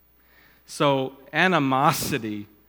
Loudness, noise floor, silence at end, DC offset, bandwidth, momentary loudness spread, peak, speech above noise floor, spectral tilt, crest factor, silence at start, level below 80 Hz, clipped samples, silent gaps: -22 LUFS; -57 dBFS; 0.25 s; under 0.1%; over 20 kHz; 10 LU; -2 dBFS; 34 dB; -4.5 dB/octave; 22 dB; 0.7 s; -58 dBFS; under 0.1%; none